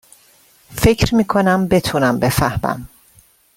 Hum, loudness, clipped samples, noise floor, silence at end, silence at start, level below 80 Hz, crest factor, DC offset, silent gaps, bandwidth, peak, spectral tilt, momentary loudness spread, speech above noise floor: none; -16 LUFS; under 0.1%; -52 dBFS; 0.7 s; 0.7 s; -34 dBFS; 16 dB; under 0.1%; none; 17 kHz; -2 dBFS; -5.5 dB/octave; 9 LU; 36 dB